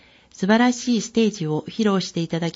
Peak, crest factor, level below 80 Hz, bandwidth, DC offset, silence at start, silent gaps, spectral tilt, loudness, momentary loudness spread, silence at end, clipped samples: -4 dBFS; 18 dB; -62 dBFS; 8 kHz; under 0.1%; 0.4 s; none; -5 dB/octave; -21 LUFS; 8 LU; 0.05 s; under 0.1%